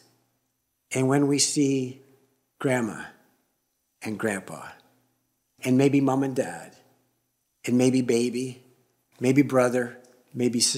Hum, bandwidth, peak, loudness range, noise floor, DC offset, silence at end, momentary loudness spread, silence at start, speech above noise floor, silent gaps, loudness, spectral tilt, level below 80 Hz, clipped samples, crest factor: none; 15.5 kHz; -6 dBFS; 7 LU; -76 dBFS; under 0.1%; 0 s; 18 LU; 0.9 s; 52 dB; none; -25 LUFS; -4.5 dB/octave; -72 dBFS; under 0.1%; 20 dB